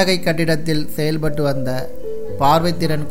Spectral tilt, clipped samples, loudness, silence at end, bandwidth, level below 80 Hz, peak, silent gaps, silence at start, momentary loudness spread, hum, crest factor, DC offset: -5.5 dB/octave; under 0.1%; -19 LUFS; 0 s; 16 kHz; -40 dBFS; -2 dBFS; none; 0 s; 12 LU; none; 16 dB; 8%